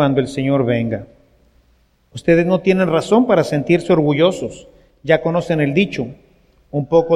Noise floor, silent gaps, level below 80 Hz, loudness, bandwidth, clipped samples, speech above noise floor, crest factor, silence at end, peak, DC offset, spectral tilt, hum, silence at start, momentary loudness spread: -57 dBFS; none; -48 dBFS; -16 LUFS; 11.5 kHz; under 0.1%; 41 dB; 16 dB; 0 s; 0 dBFS; under 0.1%; -7 dB/octave; none; 0 s; 13 LU